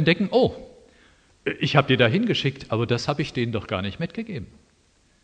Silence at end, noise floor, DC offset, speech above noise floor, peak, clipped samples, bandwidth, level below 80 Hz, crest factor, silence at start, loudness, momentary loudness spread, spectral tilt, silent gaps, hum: 0.8 s; -61 dBFS; under 0.1%; 38 dB; 0 dBFS; under 0.1%; 9.4 kHz; -54 dBFS; 24 dB; 0 s; -23 LUFS; 14 LU; -6.5 dB/octave; none; none